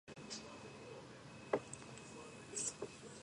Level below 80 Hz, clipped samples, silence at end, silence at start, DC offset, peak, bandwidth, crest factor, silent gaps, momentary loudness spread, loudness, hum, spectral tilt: -74 dBFS; under 0.1%; 0 s; 0.05 s; under 0.1%; -20 dBFS; 11.5 kHz; 28 dB; none; 12 LU; -47 LUFS; none; -3 dB/octave